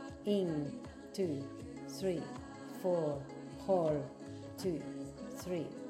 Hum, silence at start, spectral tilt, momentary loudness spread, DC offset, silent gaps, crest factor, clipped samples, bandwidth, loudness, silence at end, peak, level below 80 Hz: none; 0 s; -6.5 dB/octave; 13 LU; under 0.1%; none; 18 dB; under 0.1%; 16 kHz; -39 LUFS; 0 s; -20 dBFS; -64 dBFS